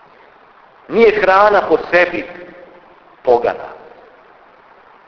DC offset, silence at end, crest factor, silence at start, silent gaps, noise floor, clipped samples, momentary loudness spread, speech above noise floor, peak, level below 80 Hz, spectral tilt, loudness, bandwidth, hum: under 0.1%; 1.3 s; 16 dB; 0.9 s; none; -46 dBFS; under 0.1%; 19 LU; 33 dB; 0 dBFS; -50 dBFS; -6 dB/octave; -13 LUFS; 5.4 kHz; none